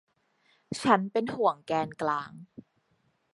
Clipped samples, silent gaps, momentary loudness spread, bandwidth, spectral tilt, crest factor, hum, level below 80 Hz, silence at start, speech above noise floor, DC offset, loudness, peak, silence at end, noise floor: under 0.1%; none; 15 LU; 11.5 kHz; -5.5 dB/octave; 24 dB; none; -70 dBFS; 0.7 s; 44 dB; under 0.1%; -28 LUFS; -6 dBFS; 0.9 s; -72 dBFS